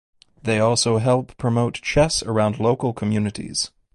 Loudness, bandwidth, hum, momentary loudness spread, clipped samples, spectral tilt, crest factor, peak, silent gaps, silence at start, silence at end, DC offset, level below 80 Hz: -21 LUFS; 11.5 kHz; none; 7 LU; under 0.1%; -5 dB/octave; 16 dB; -4 dBFS; none; 0.45 s; 0.3 s; under 0.1%; -44 dBFS